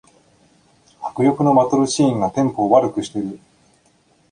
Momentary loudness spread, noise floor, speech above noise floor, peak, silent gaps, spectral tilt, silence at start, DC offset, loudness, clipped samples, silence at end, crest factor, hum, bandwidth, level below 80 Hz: 14 LU; -58 dBFS; 41 dB; 0 dBFS; none; -6 dB/octave; 1 s; under 0.1%; -17 LUFS; under 0.1%; 0.95 s; 20 dB; none; 10 kHz; -56 dBFS